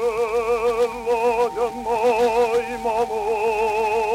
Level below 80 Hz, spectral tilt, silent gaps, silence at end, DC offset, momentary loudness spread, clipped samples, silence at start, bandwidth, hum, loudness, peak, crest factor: -48 dBFS; -4 dB/octave; none; 0 s; under 0.1%; 4 LU; under 0.1%; 0 s; 15.5 kHz; none; -21 LUFS; -8 dBFS; 12 dB